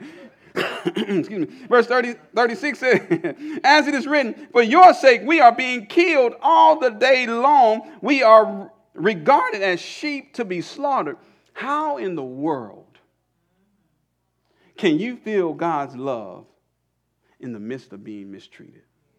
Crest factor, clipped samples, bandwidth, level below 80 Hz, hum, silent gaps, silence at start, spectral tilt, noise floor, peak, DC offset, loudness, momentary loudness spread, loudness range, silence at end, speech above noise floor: 20 dB; under 0.1%; 11.5 kHz; -70 dBFS; none; none; 0 s; -5 dB/octave; -72 dBFS; 0 dBFS; under 0.1%; -18 LUFS; 18 LU; 14 LU; 0.8 s; 54 dB